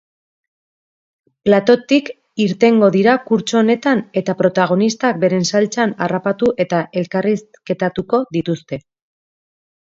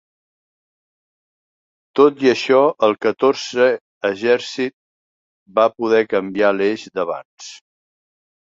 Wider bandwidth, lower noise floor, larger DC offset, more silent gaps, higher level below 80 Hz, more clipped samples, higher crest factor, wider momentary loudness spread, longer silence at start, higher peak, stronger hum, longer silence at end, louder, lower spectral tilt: about the same, 7.8 kHz vs 7.8 kHz; about the same, under -90 dBFS vs under -90 dBFS; neither; second, none vs 3.81-4.01 s, 4.73-5.46 s, 7.25-7.37 s; first, -58 dBFS vs -66 dBFS; neither; about the same, 16 dB vs 18 dB; about the same, 9 LU vs 11 LU; second, 1.45 s vs 1.95 s; about the same, 0 dBFS vs -2 dBFS; neither; first, 1.2 s vs 1 s; about the same, -16 LUFS vs -18 LUFS; about the same, -5.5 dB/octave vs -4.5 dB/octave